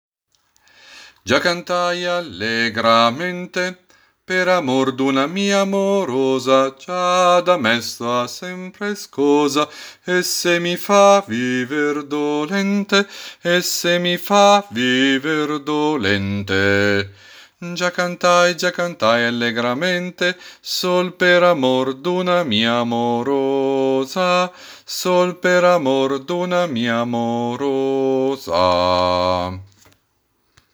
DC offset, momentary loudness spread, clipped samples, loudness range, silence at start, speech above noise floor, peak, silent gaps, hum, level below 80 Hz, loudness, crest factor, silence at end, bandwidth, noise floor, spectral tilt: under 0.1%; 9 LU; under 0.1%; 2 LU; 0.9 s; 48 dB; 0 dBFS; none; none; -60 dBFS; -18 LUFS; 18 dB; 1.1 s; over 20 kHz; -66 dBFS; -4 dB/octave